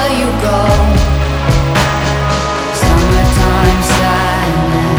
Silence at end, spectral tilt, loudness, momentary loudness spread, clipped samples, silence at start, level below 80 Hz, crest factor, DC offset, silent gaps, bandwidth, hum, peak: 0 s; -5.5 dB/octave; -12 LUFS; 3 LU; under 0.1%; 0 s; -16 dBFS; 10 dB; under 0.1%; none; over 20 kHz; none; 0 dBFS